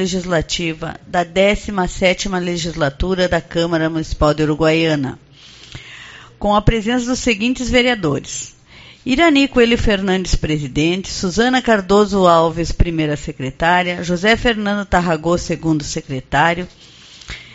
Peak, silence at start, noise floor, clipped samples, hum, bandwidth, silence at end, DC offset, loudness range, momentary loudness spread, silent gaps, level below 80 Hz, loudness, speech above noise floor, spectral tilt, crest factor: 0 dBFS; 0 s; -42 dBFS; under 0.1%; none; 8 kHz; 0 s; under 0.1%; 3 LU; 13 LU; none; -30 dBFS; -16 LUFS; 26 dB; -4 dB/octave; 16 dB